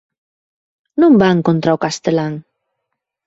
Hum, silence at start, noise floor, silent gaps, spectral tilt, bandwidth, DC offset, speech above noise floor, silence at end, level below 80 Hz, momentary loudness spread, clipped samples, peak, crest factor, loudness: none; 0.95 s; -76 dBFS; none; -6.5 dB/octave; 8 kHz; under 0.1%; 63 dB; 0.85 s; -56 dBFS; 14 LU; under 0.1%; -2 dBFS; 14 dB; -14 LUFS